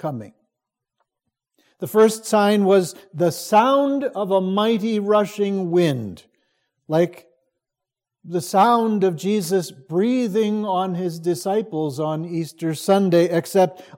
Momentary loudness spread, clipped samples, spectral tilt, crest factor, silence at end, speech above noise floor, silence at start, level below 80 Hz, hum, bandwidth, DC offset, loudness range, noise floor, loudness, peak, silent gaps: 10 LU; under 0.1%; -6 dB/octave; 16 dB; 0.15 s; 66 dB; 0.05 s; -72 dBFS; none; 16.5 kHz; under 0.1%; 4 LU; -85 dBFS; -20 LUFS; -4 dBFS; none